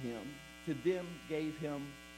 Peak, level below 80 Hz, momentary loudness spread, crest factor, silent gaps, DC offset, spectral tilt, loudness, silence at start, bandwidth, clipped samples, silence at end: -22 dBFS; -66 dBFS; 10 LU; 18 dB; none; under 0.1%; -6 dB/octave; -40 LUFS; 0 s; 16 kHz; under 0.1%; 0 s